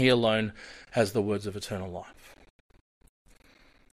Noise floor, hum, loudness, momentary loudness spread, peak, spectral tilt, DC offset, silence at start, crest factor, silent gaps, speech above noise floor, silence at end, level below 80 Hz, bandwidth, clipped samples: -60 dBFS; none; -29 LUFS; 18 LU; -10 dBFS; -5.5 dB/octave; under 0.1%; 0 s; 22 dB; none; 31 dB; 1.65 s; -58 dBFS; 15.5 kHz; under 0.1%